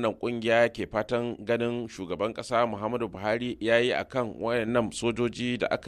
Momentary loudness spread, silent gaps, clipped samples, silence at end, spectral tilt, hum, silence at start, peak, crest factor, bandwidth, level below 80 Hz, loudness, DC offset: 7 LU; none; under 0.1%; 0 s; -5 dB/octave; none; 0 s; -10 dBFS; 18 dB; 12.5 kHz; -56 dBFS; -28 LUFS; under 0.1%